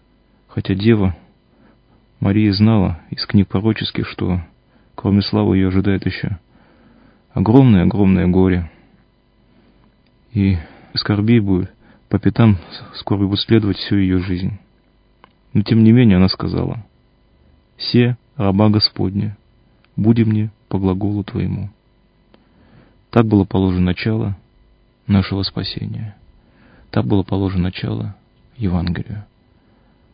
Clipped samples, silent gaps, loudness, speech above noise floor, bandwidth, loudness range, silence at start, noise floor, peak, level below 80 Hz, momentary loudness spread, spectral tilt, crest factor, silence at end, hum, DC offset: under 0.1%; none; -17 LUFS; 40 dB; 5.2 kHz; 5 LU; 0.55 s; -56 dBFS; 0 dBFS; -34 dBFS; 13 LU; -11 dB/octave; 18 dB; 0.9 s; none; under 0.1%